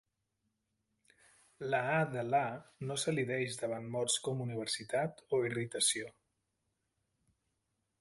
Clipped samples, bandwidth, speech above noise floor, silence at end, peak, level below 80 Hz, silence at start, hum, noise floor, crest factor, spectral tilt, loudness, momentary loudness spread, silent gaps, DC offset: under 0.1%; 12 kHz; 48 dB; 1.9 s; -18 dBFS; -76 dBFS; 1.6 s; none; -84 dBFS; 20 dB; -3.5 dB/octave; -35 LUFS; 8 LU; none; under 0.1%